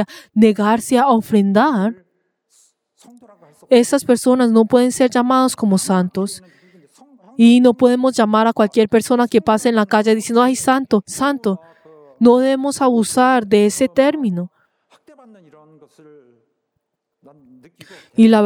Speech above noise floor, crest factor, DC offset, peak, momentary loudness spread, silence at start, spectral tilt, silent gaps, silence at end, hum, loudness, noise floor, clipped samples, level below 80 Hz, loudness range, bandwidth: 60 dB; 16 dB; under 0.1%; 0 dBFS; 9 LU; 0 s; -5 dB/octave; none; 0 s; none; -15 LUFS; -74 dBFS; under 0.1%; -60 dBFS; 4 LU; 16 kHz